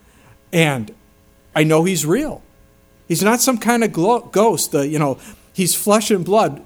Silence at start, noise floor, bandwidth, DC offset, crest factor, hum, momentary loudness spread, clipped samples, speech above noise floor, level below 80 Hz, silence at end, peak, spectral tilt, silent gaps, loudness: 0.5 s; -51 dBFS; over 20 kHz; under 0.1%; 18 dB; none; 11 LU; under 0.1%; 35 dB; -50 dBFS; 0.05 s; 0 dBFS; -4.5 dB/octave; none; -17 LUFS